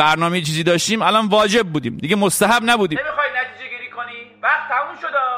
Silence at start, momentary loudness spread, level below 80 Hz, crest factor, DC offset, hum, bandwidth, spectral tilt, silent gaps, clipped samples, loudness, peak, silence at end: 0 s; 14 LU; -54 dBFS; 18 dB; under 0.1%; none; 16 kHz; -3.5 dB/octave; none; under 0.1%; -17 LUFS; 0 dBFS; 0 s